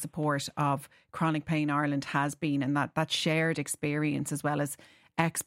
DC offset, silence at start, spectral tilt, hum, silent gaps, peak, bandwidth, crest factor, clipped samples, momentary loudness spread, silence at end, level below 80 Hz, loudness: under 0.1%; 0 s; -5 dB/octave; none; none; -10 dBFS; 16 kHz; 20 dB; under 0.1%; 5 LU; 0.05 s; -66 dBFS; -30 LUFS